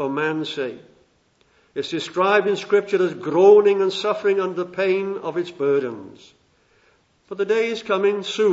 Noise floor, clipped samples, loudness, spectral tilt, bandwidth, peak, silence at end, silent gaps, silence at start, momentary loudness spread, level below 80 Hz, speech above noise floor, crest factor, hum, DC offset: -61 dBFS; under 0.1%; -20 LUFS; -5 dB/octave; 8 kHz; -4 dBFS; 0 s; none; 0 s; 14 LU; -72 dBFS; 41 dB; 18 dB; none; under 0.1%